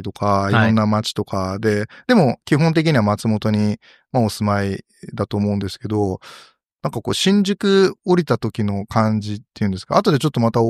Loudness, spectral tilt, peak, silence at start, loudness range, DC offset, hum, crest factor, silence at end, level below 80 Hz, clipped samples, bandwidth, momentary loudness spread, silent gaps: -19 LUFS; -6.5 dB/octave; -2 dBFS; 0 s; 5 LU; under 0.1%; none; 16 dB; 0 s; -54 dBFS; under 0.1%; 14 kHz; 9 LU; 6.73-6.77 s